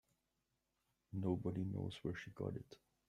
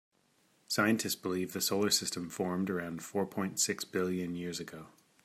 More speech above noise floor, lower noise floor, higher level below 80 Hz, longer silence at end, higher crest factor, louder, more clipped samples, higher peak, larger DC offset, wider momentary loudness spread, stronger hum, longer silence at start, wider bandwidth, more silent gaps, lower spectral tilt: first, 43 dB vs 37 dB; first, -87 dBFS vs -71 dBFS; about the same, -72 dBFS vs -76 dBFS; about the same, 0.3 s vs 0.35 s; about the same, 20 dB vs 20 dB; second, -45 LUFS vs -33 LUFS; neither; second, -26 dBFS vs -14 dBFS; neither; about the same, 10 LU vs 9 LU; neither; first, 1.1 s vs 0.7 s; second, 10.5 kHz vs 16 kHz; neither; first, -8 dB/octave vs -3.5 dB/octave